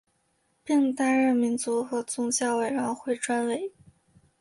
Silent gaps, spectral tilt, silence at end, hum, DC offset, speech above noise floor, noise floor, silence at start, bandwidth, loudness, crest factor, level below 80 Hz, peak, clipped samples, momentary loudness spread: none; -3 dB/octave; 0.7 s; none; under 0.1%; 45 dB; -71 dBFS; 0.65 s; 11.5 kHz; -26 LUFS; 14 dB; -72 dBFS; -14 dBFS; under 0.1%; 7 LU